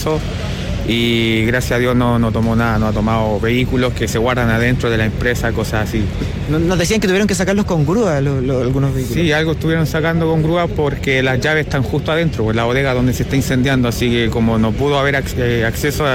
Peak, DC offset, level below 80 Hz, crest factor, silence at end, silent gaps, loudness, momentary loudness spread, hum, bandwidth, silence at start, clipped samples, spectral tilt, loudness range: -4 dBFS; under 0.1%; -28 dBFS; 10 dB; 0 s; none; -16 LUFS; 4 LU; none; 17 kHz; 0 s; under 0.1%; -6 dB/octave; 1 LU